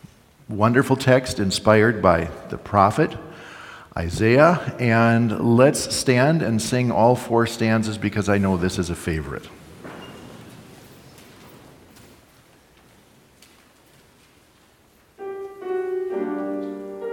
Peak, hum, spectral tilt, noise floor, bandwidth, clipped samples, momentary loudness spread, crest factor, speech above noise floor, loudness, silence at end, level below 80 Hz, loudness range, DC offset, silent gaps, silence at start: 0 dBFS; none; -5.5 dB/octave; -56 dBFS; 17.5 kHz; under 0.1%; 22 LU; 22 dB; 37 dB; -20 LUFS; 0 s; -50 dBFS; 15 LU; under 0.1%; none; 0.5 s